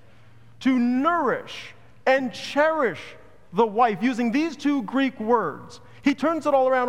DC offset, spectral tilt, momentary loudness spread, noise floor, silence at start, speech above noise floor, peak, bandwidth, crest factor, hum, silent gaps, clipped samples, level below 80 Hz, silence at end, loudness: 0.4%; -5.5 dB/octave; 11 LU; -53 dBFS; 0.6 s; 30 dB; -6 dBFS; 11 kHz; 16 dB; none; none; under 0.1%; -66 dBFS; 0 s; -23 LUFS